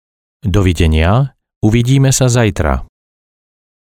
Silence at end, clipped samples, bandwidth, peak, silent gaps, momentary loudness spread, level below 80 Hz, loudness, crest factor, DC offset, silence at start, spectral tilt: 1.05 s; under 0.1%; 16 kHz; 0 dBFS; 1.56-1.61 s; 8 LU; -24 dBFS; -13 LUFS; 14 dB; under 0.1%; 0.45 s; -5.5 dB/octave